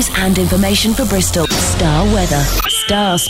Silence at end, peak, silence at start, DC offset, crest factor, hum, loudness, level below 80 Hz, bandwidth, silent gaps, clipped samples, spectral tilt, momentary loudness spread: 0 s; -2 dBFS; 0 s; under 0.1%; 10 dB; none; -13 LUFS; -22 dBFS; 16.5 kHz; none; under 0.1%; -4 dB/octave; 1 LU